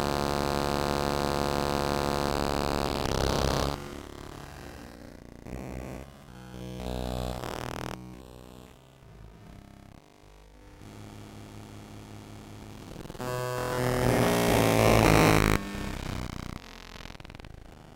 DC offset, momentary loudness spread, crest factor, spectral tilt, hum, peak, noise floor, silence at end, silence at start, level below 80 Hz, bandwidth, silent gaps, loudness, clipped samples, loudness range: under 0.1%; 24 LU; 22 dB; -5 dB/octave; none; -8 dBFS; -54 dBFS; 0 s; 0 s; -42 dBFS; 17 kHz; none; -28 LUFS; under 0.1%; 23 LU